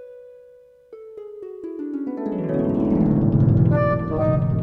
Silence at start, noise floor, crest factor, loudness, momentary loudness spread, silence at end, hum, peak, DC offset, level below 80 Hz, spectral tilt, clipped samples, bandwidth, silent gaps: 0 s; -49 dBFS; 16 dB; -20 LUFS; 20 LU; 0 s; none; -6 dBFS; under 0.1%; -38 dBFS; -12 dB/octave; under 0.1%; 4.3 kHz; none